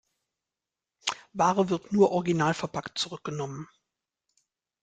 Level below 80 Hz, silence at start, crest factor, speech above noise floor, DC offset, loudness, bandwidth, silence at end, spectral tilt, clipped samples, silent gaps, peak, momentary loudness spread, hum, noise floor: -66 dBFS; 1.05 s; 20 dB; 63 dB; under 0.1%; -28 LUFS; 9.4 kHz; 1.2 s; -5 dB/octave; under 0.1%; none; -8 dBFS; 12 LU; none; -89 dBFS